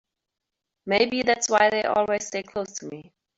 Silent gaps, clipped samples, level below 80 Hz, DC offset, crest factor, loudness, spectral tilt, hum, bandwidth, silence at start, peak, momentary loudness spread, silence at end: none; under 0.1%; -62 dBFS; under 0.1%; 20 dB; -23 LUFS; -2.5 dB/octave; none; 8 kHz; 0.85 s; -6 dBFS; 19 LU; 0.35 s